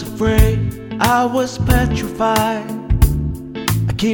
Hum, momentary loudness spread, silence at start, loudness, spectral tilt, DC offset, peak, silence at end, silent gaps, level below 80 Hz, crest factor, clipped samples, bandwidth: none; 8 LU; 0 s; -17 LUFS; -6 dB/octave; under 0.1%; 0 dBFS; 0 s; none; -22 dBFS; 16 dB; under 0.1%; over 20 kHz